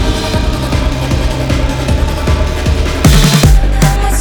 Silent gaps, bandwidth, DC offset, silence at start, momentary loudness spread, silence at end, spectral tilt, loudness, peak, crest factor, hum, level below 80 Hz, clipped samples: none; over 20 kHz; under 0.1%; 0 s; 7 LU; 0 s; -5 dB/octave; -12 LUFS; 0 dBFS; 10 dB; none; -12 dBFS; 0.5%